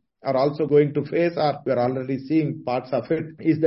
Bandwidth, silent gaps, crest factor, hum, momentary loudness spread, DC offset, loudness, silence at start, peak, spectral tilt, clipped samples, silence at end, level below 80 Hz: 5.8 kHz; none; 16 dB; none; 7 LU; under 0.1%; -23 LUFS; 0.25 s; -6 dBFS; -11 dB/octave; under 0.1%; 0 s; -64 dBFS